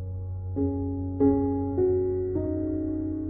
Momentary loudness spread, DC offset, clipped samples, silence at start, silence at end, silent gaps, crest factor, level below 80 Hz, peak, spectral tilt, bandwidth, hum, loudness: 8 LU; under 0.1%; under 0.1%; 0 s; 0 s; none; 16 dB; -46 dBFS; -12 dBFS; -15 dB/octave; 2.2 kHz; none; -27 LUFS